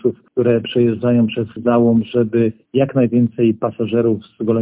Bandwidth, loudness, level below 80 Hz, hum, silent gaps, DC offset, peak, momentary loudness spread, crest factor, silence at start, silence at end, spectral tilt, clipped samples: 3.8 kHz; -17 LUFS; -52 dBFS; none; none; under 0.1%; -2 dBFS; 5 LU; 14 dB; 0.05 s; 0 s; -12 dB/octave; under 0.1%